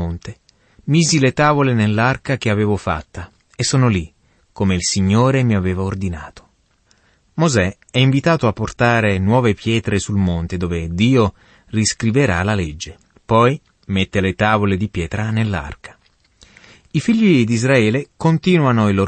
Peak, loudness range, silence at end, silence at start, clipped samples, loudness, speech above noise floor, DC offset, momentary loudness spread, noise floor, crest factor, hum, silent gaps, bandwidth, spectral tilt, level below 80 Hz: -2 dBFS; 3 LU; 0 s; 0 s; under 0.1%; -17 LUFS; 42 dB; under 0.1%; 12 LU; -58 dBFS; 16 dB; none; none; 8.8 kHz; -5.5 dB/octave; -40 dBFS